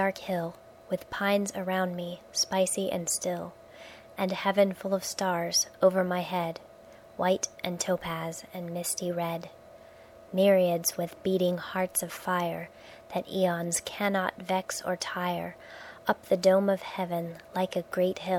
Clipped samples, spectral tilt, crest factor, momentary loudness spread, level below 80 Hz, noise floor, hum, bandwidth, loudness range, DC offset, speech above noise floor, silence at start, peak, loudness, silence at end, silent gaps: under 0.1%; -4 dB/octave; 20 dB; 13 LU; -66 dBFS; -52 dBFS; none; 17 kHz; 3 LU; under 0.1%; 23 dB; 0 s; -10 dBFS; -29 LUFS; 0 s; none